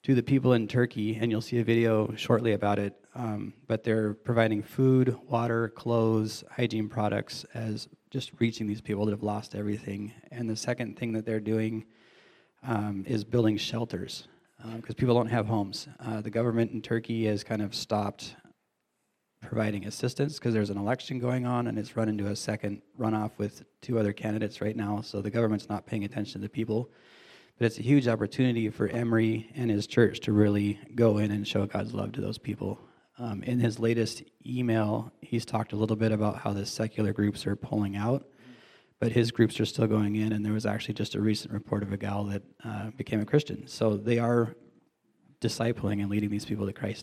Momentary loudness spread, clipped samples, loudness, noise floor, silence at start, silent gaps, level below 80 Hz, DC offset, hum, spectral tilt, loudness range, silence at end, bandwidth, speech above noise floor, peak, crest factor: 11 LU; under 0.1%; -29 LUFS; -78 dBFS; 0.05 s; none; -66 dBFS; under 0.1%; none; -6.5 dB/octave; 5 LU; 0 s; 14 kHz; 50 dB; -8 dBFS; 20 dB